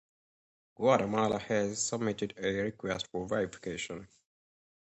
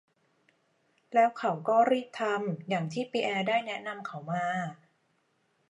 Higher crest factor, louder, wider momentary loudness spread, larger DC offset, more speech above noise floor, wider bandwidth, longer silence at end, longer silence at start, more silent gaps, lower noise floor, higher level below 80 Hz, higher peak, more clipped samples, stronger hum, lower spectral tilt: about the same, 22 dB vs 20 dB; about the same, -32 LUFS vs -30 LUFS; about the same, 11 LU vs 11 LU; neither; first, over 58 dB vs 44 dB; second, 8.4 kHz vs 11 kHz; second, 0.8 s vs 0.95 s; second, 0.8 s vs 1.1 s; neither; first, under -90 dBFS vs -73 dBFS; first, -64 dBFS vs -84 dBFS; about the same, -12 dBFS vs -12 dBFS; neither; neither; second, -4.5 dB/octave vs -6 dB/octave